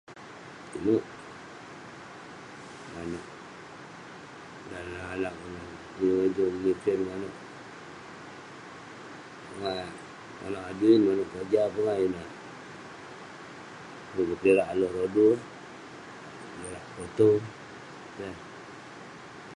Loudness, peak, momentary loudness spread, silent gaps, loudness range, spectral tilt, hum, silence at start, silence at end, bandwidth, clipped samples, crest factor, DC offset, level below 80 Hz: -28 LUFS; -10 dBFS; 21 LU; none; 12 LU; -6.5 dB/octave; none; 0.1 s; 0.05 s; 11 kHz; under 0.1%; 22 dB; under 0.1%; -62 dBFS